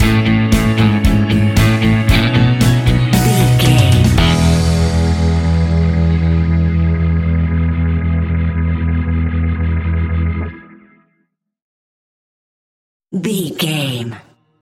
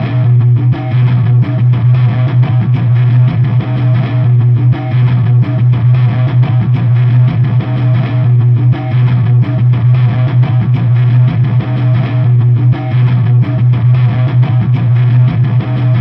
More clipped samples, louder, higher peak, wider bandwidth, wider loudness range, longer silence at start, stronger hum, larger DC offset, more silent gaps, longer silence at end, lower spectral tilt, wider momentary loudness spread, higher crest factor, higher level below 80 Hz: neither; second, -14 LUFS vs -10 LUFS; about the same, 0 dBFS vs -2 dBFS; first, 17 kHz vs 4.1 kHz; first, 12 LU vs 0 LU; about the same, 0 s vs 0 s; neither; neither; first, 11.62-13.00 s vs none; first, 0.4 s vs 0 s; second, -6 dB/octave vs -11 dB/octave; first, 7 LU vs 3 LU; first, 14 dB vs 8 dB; first, -22 dBFS vs -38 dBFS